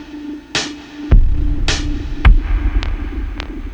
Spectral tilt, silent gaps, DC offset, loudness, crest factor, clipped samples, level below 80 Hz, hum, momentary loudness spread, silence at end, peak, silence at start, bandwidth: -4.5 dB/octave; none; under 0.1%; -19 LUFS; 14 dB; under 0.1%; -16 dBFS; none; 13 LU; 0 s; 0 dBFS; 0 s; 9 kHz